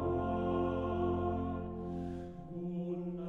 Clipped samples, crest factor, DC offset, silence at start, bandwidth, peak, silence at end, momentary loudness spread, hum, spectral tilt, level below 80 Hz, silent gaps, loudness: under 0.1%; 14 dB; under 0.1%; 0 s; 4.1 kHz; -22 dBFS; 0 s; 9 LU; none; -10 dB/octave; -52 dBFS; none; -37 LUFS